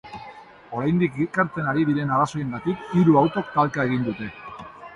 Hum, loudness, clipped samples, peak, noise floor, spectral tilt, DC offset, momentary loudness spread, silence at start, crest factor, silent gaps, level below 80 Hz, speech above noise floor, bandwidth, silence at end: none; -22 LUFS; under 0.1%; -6 dBFS; -44 dBFS; -8 dB/octave; under 0.1%; 20 LU; 0.05 s; 18 dB; none; -56 dBFS; 22 dB; 10.5 kHz; 0 s